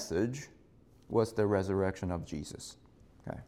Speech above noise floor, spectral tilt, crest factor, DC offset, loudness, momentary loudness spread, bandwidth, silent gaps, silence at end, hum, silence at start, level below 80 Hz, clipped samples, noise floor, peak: 28 dB; -6 dB/octave; 18 dB; under 0.1%; -34 LUFS; 17 LU; 15.5 kHz; none; 0.05 s; none; 0 s; -60 dBFS; under 0.1%; -61 dBFS; -16 dBFS